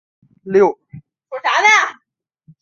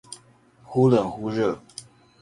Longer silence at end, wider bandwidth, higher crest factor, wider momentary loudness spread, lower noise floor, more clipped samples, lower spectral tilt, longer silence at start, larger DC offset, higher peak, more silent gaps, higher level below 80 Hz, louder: first, 0.7 s vs 0.4 s; second, 7.4 kHz vs 11.5 kHz; about the same, 16 dB vs 20 dB; second, 18 LU vs 23 LU; first, -60 dBFS vs -55 dBFS; neither; second, -3 dB/octave vs -7 dB/octave; first, 0.45 s vs 0.1 s; neither; first, -2 dBFS vs -6 dBFS; neither; about the same, -64 dBFS vs -60 dBFS; first, -14 LUFS vs -23 LUFS